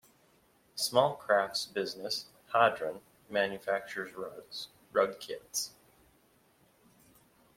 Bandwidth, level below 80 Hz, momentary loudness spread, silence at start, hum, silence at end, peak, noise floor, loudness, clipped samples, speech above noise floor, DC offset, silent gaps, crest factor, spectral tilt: 16.5 kHz; -76 dBFS; 15 LU; 0.75 s; none; 1.9 s; -10 dBFS; -67 dBFS; -33 LUFS; under 0.1%; 35 dB; under 0.1%; none; 24 dB; -2.5 dB/octave